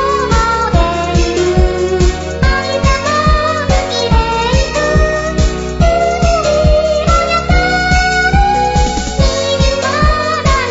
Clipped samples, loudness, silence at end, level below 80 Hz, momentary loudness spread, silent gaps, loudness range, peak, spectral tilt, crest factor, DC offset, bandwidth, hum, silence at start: under 0.1%; -12 LUFS; 0 s; -16 dBFS; 3 LU; none; 1 LU; 0 dBFS; -5 dB/octave; 12 dB; under 0.1%; 8 kHz; none; 0 s